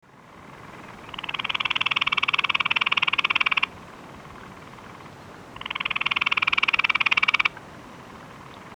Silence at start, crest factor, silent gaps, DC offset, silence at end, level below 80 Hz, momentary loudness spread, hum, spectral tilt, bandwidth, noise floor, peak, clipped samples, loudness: 0.35 s; 24 dB; none; under 0.1%; 0 s; -58 dBFS; 23 LU; none; -2 dB/octave; 19.5 kHz; -47 dBFS; -2 dBFS; under 0.1%; -22 LUFS